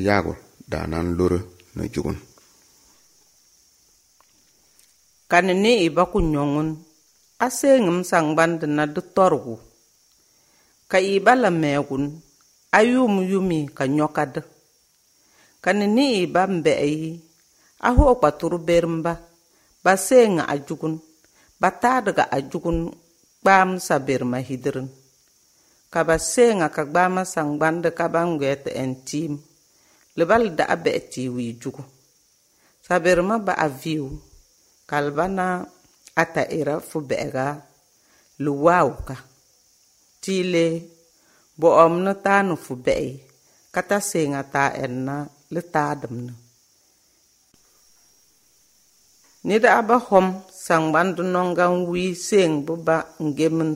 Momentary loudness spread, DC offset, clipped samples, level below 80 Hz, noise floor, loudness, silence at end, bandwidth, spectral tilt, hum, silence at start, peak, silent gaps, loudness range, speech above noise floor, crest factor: 14 LU; under 0.1%; under 0.1%; -42 dBFS; -61 dBFS; -21 LUFS; 0 s; 16 kHz; -5.5 dB/octave; none; 0 s; 0 dBFS; none; 6 LU; 41 dB; 22 dB